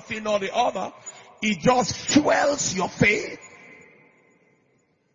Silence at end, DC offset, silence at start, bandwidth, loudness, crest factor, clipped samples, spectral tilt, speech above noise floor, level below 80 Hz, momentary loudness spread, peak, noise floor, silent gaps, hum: 1.4 s; under 0.1%; 0.05 s; 7.6 kHz; -22 LUFS; 20 dB; under 0.1%; -3.5 dB/octave; 43 dB; -56 dBFS; 15 LU; -4 dBFS; -66 dBFS; none; none